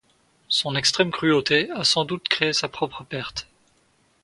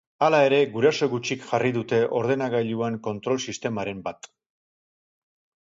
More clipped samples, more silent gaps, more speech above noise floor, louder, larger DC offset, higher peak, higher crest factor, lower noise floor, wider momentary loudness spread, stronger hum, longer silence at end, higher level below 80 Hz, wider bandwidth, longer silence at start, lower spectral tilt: neither; neither; second, 40 dB vs over 66 dB; about the same, -22 LUFS vs -24 LUFS; neither; first, 0 dBFS vs -6 dBFS; first, 24 dB vs 18 dB; second, -63 dBFS vs under -90 dBFS; about the same, 11 LU vs 10 LU; neither; second, 0.8 s vs 1.4 s; first, -58 dBFS vs -66 dBFS; first, 11.5 kHz vs 7.8 kHz; first, 0.5 s vs 0.2 s; second, -3 dB/octave vs -5 dB/octave